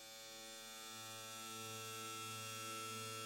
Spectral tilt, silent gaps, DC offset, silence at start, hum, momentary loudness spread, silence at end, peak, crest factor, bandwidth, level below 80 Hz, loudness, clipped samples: -1.5 dB/octave; none; under 0.1%; 0 s; none; 6 LU; 0 s; -36 dBFS; 14 dB; 16.5 kHz; -88 dBFS; -48 LUFS; under 0.1%